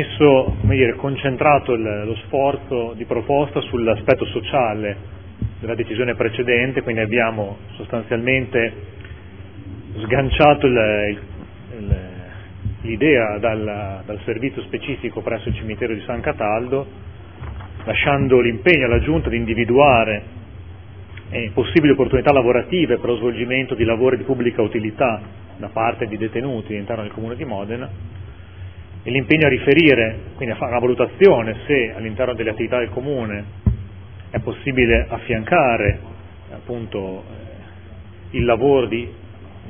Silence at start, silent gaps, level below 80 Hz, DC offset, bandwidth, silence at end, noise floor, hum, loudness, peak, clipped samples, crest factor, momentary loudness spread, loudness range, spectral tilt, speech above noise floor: 0 s; none; -36 dBFS; 0.5%; 5.4 kHz; 0 s; -38 dBFS; none; -19 LUFS; 0 dBFS; under 0.1%; 20 dB; 22 LU; 7 LU; -9.5 dB/octave; 20 dB